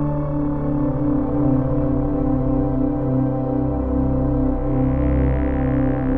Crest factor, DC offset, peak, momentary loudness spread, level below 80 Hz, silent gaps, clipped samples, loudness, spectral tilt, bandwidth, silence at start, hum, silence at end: 12 dB; 1%; -8 dBFS; 2 LU; -26 dBFS; none; under 0.1%; -20 LUFS; -13 dB/octave; 3.3 kHz; 0 s; none; 0 s